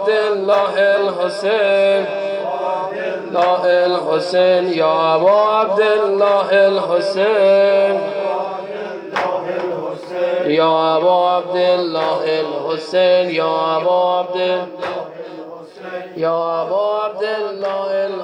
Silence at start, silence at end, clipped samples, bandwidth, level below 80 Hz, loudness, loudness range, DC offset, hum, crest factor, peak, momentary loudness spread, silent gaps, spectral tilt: 0 s; 0 s; under 0.1%; 10 kHz; -74 dBFS; -16 LUFS; 6 LU; under 0.1%; none; 12 dB; -4 dBFS; 11 LU; none; -5.5 dB/octave